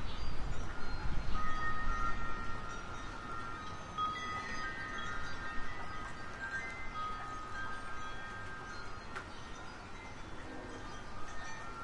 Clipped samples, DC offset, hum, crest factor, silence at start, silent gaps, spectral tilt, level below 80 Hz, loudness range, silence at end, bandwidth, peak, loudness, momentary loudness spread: under 0.1%; under 0.1%; none; 16 dB; 0 s; none; -4.5 dB/octave; -44 dBFS; 6 LU; 0 s; 9.8 kHz; -20 dBFS; -42 LUFS; 10 LU